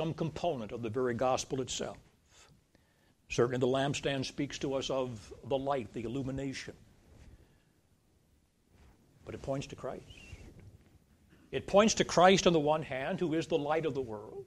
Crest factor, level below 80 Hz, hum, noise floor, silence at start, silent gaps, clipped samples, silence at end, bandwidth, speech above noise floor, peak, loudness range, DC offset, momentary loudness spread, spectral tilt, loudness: 24 dB; -58 dBFS; none; -70 dBFS; 0 s; none; under 0.1%; 0 s; 13 kHz; 38 dB; -10 dBFS; 16 LU; under 0.1%; 17 LU; -4.5 dB/octave; -32 LUFS